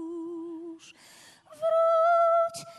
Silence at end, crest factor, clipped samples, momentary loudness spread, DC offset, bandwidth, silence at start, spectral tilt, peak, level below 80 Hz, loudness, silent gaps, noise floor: 0 s; 12 dB; under 0.1%; 19 LU; under 0.1%; 12 kHz; 0 s; -4 dB/octave; -16 dBFS; -82 dBFS; -24 LUFS; none; -54 dBFS